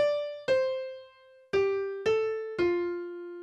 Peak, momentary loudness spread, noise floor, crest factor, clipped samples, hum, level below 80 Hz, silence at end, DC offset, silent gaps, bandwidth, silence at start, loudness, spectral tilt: -16 dBFS; 10 LU; -56 dBFS; 14 dB; under 0.1%; none; -64 dBFS; 0 s; under 0.1%; none; 8.4 kHz; 0 s; -30 LUFS; -5.5 dB/octave